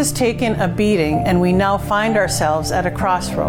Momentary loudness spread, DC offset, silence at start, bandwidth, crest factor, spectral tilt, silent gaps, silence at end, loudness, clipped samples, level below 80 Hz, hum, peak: 3 LU; under 0.1%; 0 s; 18.5 kHz; 10 dB; -5 dB/octave; none; 0 s; -17 LUFS; under 0.1%; -34 dBFS; none; -6 dBFS